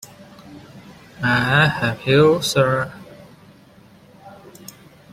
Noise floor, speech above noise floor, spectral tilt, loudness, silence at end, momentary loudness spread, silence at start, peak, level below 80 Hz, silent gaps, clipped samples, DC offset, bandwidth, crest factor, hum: -48 dBFS; 31 dB; -5 dB/octave; -17 LUFS; 0.8 s; 26 LU; 0.45 s; -2 dBFS; -52 dBFS; none; under 0.1%; under 0.1%; 16 kHz; 20 dB; none